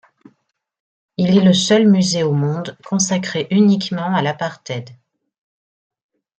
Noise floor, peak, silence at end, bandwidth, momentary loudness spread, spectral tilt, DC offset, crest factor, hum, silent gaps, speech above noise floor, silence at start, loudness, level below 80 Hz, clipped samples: -67 dBFS; -2 dBFS; 1.45 s; 9 kHz; 14 LU; -5 dB/octave; under 0.1%; 16 dB; none; none; 51 dB; 1.2 s; -16 LUFS; -60 dBFS; under 0.1%